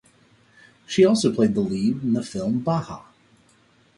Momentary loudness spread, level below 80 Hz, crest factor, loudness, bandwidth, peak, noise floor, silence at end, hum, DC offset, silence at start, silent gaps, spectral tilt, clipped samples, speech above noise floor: 9 LU; -58 dBFS; 18 dB; -22 LUFS; 11.5 kHz; -6 dBFS; -59 dBFS; 0.95 s; none; under 0.1%; 0.9 s; none; -6 dB/octave; under 0.1%; 38 dB